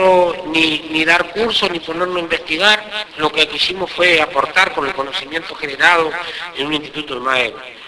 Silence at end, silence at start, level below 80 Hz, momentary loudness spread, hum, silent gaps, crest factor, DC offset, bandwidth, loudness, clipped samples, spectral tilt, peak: 0 s; 0 s; -48 dBFS; 10 LU; none; none; 16 dB; under 0.1%; 11 kHz; -15 LUFS; under 0.1%; -3 dB/octave; 0 dBFS